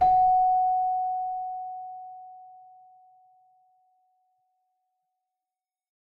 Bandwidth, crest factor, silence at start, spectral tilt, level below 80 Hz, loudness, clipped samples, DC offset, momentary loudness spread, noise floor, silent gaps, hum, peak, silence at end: 4.2 kHz; 16 dB; 0 s; -7 dB/octave; -58 dBFS; -25 LUFS; under 0.1%; under 0.1%; 23 LU; under -90 dBFS; none; none; -12 dBFS; 3.65 s